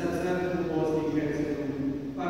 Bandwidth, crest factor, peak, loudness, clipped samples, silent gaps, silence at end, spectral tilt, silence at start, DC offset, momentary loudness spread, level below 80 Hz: 16 kHz; 12 dB; -16 dBFS; -29 LUFS; under 0.1%; none; 0 s; -7.5 dB/octave; 0 s; 0.2%; 4 LU; -54 dBFS